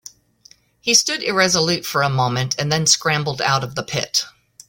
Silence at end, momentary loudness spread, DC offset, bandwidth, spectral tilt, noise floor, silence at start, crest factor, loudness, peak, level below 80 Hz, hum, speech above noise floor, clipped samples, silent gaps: 0.4 s; 7 LU; under 0.1%; 17 kHz; -2.5 dB/octave; -52 dBFS; 0.85 s; 20 dB; -18 LUFS; -2 dBFS; -54 dBFS; none; 33 dB; under 0.1%; none